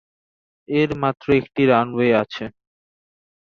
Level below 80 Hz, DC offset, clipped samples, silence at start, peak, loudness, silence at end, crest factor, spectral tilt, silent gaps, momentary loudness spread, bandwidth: -54 dBFS; under 0.1%; under 0.1%; 0.7 s; -2 dBFS; -19 LUFS; 0.95 s; 20 dB; -8 dB/octave; none; 12 LU; 6.8 kHz